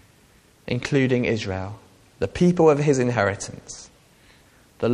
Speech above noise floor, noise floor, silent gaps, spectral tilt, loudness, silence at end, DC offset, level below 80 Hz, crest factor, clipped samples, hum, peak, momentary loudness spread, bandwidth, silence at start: 34 dB; -55 dBFS; none; -6 dB/octave; -22 LUFS; 0 s; under 0.1%; -50 dBFS; 20 dB; under 0.1%; none; -4 dBFS; 20 LU; 11.5 kHz; 0.65 s